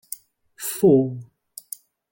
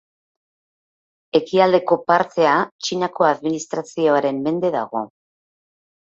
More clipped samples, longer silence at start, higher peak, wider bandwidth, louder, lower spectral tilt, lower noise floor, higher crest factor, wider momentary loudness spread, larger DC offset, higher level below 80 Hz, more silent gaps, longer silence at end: neither; second, 0.6 s vs 1.35 s; second, -6 dBFS vs -2 dBFS; first, 17 kHz vs 8 kHz; about the same, -20 LUFS vs -19 LUFS; first, -6.5 dB/octave vs -5 dB/octave; second, -46 dBFS vs under -90 dBFS; about the same, 18 dB vs 18 dB; first, 23 LU vs 10 LU; neither; about the same, -62 dBFS vs -66 dBFS; second, none vs 2.72-2.79 s; about the same, 0.9 s vs 1 s